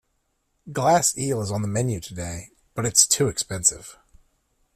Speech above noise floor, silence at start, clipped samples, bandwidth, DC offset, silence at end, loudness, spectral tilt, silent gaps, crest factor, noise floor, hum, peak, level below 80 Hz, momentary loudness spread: 49 dB; 0.65 s; under 0.1%; 16 kHz; under 0.1%; 0.85 s; -21 LUFS; -3 dB/octave; none; 24 dB; -72 dBFS; none; 0 dBFS; -52 dBFS; 16 LU